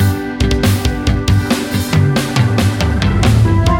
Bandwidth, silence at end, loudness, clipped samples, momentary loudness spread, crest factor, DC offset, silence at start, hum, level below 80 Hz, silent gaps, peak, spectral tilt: 17 kHz; 0 s; -14 LUFS; under 0.1%; 5 LU; 12 dB; under 0.1%; 0 s; none; -22 dBFS; none; -2 dBFS; -6 dB/octave